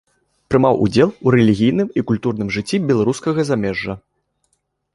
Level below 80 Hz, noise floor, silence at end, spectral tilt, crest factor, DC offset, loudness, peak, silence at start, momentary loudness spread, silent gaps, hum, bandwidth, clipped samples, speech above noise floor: -46 dBFS; -68 dBFS; 0.95 s; -7 dB/octave; 16 dB; under 0.1%; -17 LUFS; -2 dBFS; 0.5 s; 8 LU; none; none; 11.5 kHz; under 0.1%; 52 dB